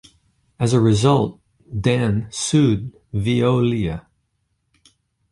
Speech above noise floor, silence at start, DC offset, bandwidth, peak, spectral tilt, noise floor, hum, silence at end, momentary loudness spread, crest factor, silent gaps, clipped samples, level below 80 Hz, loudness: 52 dB; 0.6 s; under 0.1%; 11.5 kHz; -2 dBFS; -6 dB/octave; -70 dBFS; none; 1.3 s; 11 LU; 18 dB; none; under 0.1%; -44 dBFS; -19 LUFS